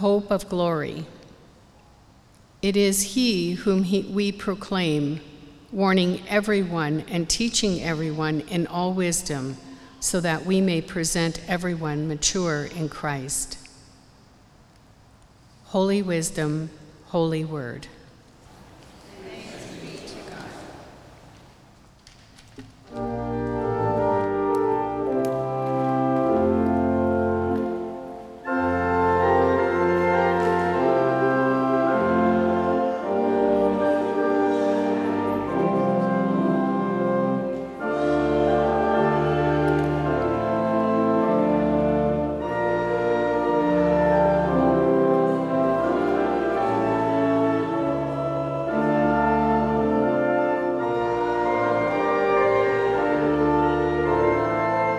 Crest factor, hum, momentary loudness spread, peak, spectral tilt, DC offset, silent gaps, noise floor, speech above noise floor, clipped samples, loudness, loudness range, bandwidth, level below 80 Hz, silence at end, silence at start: 16 dB; none; 9 LU; -6 dBFS; -5.5 dB/octave; under 0.1%; none; -53 dBFS; 29 dB; under 0.1%; -23 LUFS; 10 LU; 15 kHz; -46 dBFS; 0 s; 0 s